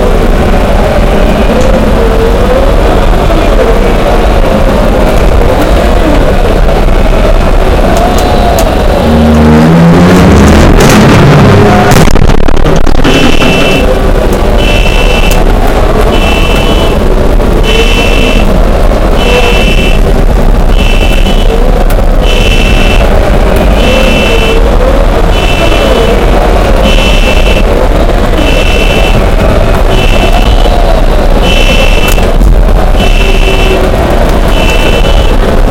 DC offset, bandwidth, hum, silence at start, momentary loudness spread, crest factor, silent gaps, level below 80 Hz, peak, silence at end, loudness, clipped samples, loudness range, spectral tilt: 2%; 16.5 kHz; none; 0 s; 6 LU; 4 dB; none; -6 dBFS; 0 dBFS; 0 s; -6 LUFS; 10%; 4 LU; -5.5 dB/octave